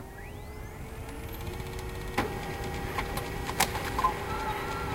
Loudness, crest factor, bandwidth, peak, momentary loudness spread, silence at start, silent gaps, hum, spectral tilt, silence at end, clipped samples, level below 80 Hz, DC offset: -34 LUFS; 24 dB; 17 kHz; -8 dBFS; 14 LU; 0 s; none; none; -4 dB/octave; 0 s; under 0.1%; -42 dBFS; under 0.1%